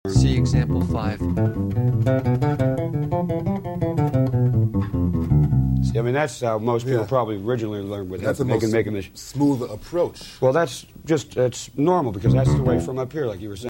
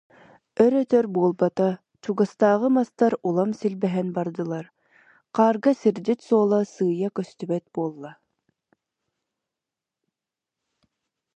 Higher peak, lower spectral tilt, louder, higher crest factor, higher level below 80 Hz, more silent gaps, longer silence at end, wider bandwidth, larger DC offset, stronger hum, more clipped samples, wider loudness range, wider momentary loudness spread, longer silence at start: about the same, -4 dBFS vs -4 dBFS; about the same, -7.5 dB/octave vs -8 dB/octave; about the same, -22 LUFS vs -23 LUFS; about the same, 16 dB vs 20 dB; first, -36 dBFS vs -74 dBFS; neither; second, 0 s vs 3.25 s; first, 16.5 kHz vs 9 kHz; neither; neither; neither; second, 2 LU vs 12 LU; second, 8 LU vs 11 LU; second, 0.05 s vs 0.6 s